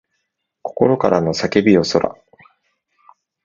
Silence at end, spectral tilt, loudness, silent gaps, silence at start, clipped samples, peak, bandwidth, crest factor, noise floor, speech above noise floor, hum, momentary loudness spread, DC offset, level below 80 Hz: 1.35 s; -6 dB/octave; -16 LUFS; none; 0.65 s; under 0.1%; 0 dBFS; 7.6 kHz; 18 dB; -73 dBFS; 58 dB; none; 13 LU; under 0.1%; -50 dBFS